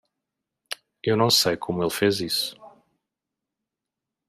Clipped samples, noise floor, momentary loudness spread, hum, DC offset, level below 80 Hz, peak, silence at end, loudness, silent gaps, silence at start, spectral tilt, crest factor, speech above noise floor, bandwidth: under 0.1%; -86 dBFS; 18 LU; none; under 0.1%; -64 dBFS; -6 dBFS; 1.6 s; -23 LUFS; none; 0.7 s; -3.5 dB/octave; 20 dB; 64 dB; 15.5 kHz